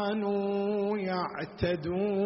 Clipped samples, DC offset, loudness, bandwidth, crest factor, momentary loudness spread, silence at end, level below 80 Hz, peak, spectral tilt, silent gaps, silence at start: under 0.1%; under 0.1%; -31 LUFS; 5.8 kHz; 14 dB; 3 LU; 0 s; -56 dBFS; -16 dBFS; -5.5 dB/octave; none; 0 s